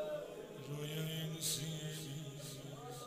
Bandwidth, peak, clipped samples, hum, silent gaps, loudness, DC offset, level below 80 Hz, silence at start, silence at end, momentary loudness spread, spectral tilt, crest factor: 16 kHz; -26 dBFS; under 0.1%; none; none; -43 LUFS; under 0.1%; -72 dBFS; 0 s; 0 s; 11 LU; -4 dB/octave; 18 dB